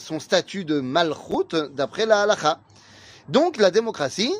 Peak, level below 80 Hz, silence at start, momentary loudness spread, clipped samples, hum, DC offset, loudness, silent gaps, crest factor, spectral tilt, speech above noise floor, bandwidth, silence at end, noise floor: -4 dBFS; -64 dBFS; 0 s; 8 LU; under 0.1%; none; under 0.1%; -22 LUFS; none; 18 dB; -4 dB/octave; 26 dB; 15.5 kHz; 0 s; -48 dBFS